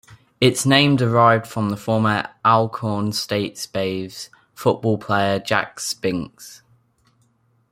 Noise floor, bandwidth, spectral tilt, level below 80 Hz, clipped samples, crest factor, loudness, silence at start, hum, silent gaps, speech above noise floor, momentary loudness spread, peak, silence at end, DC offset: -62 dBFS; 16 kHz; -5 dB/octave; -58 dBFS; under 0.1%; 20 dB; -20 LUFS; 0.1 s; none; none; 43 dB; 14 LU; -2 dBFS; 1.15 s; under 0.1%